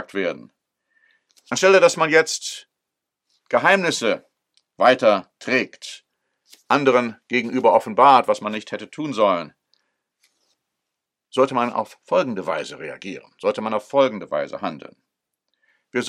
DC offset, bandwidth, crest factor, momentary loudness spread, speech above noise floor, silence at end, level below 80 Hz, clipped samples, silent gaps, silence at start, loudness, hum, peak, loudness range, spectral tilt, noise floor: under 0.1%; 13.5 kHz; 22 dB; 17 LU; 63 dB; 0 s; -76 dBFS; under 0.1%; none; 0 s; -20 LUFS; none; 0 dBFS; 6 LU; -3.5 dB/octave; -83 dBFS